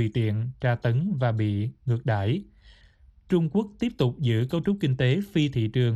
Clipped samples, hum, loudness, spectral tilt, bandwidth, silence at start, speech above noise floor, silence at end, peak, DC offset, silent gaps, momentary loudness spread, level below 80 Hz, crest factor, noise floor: under 0.1%; none; -26 LUFS; -8 dB/octave; 7.8 kHz; 0 s; 31 dB; 0 s; -10 dBFS; under 0.1%; none; 4 LU; -54 dBFS; 16 dB; -55 dBFS